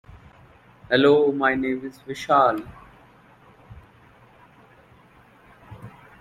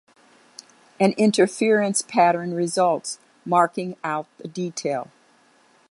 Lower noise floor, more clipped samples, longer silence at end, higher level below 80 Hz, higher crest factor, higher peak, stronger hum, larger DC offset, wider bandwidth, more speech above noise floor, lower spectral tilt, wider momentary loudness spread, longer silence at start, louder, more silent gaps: second, -53 dBFS vs -58 dBFS; neither; second, 0.3 s vs 0.85 s; first, -58 dBFS vs -74 dBFS; about the same, 22 dB vs 20 dB; about the same, -4 dBFS vs -4 dBFS; neither; neither; first, 13 kHz vs 11.5 kHz; second, 33 dB vs 37 dB; first, -6 dB/octave vs -4.5 dB/octave; first, 26 LU vs 12 LU; second, 0.1 s vs 1 s; about the same, -21 LUFS vs -22 LUFS; neither